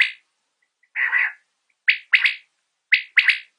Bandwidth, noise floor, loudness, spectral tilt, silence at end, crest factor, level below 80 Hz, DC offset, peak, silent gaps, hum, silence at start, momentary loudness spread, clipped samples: 10.5 kHz; -72 dBFS; -19 LUFS; 4 dB/octave; 0.15 s; 20 dB; -86 dBFS; under 0.1%; -4 dBFS; none; none; 0 s; 8 LU; under 0.1%